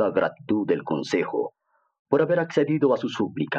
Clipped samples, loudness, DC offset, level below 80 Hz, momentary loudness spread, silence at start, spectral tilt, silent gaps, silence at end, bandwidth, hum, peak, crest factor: under 0.1%; -24 LUFS; under 0.1%; -70 dBFS; 6 LU; 0 s; -6.5 dB/octave; 1.99-2.05 s; 0 s; 8.4 kHz; none; -8 dBFS; 16 dB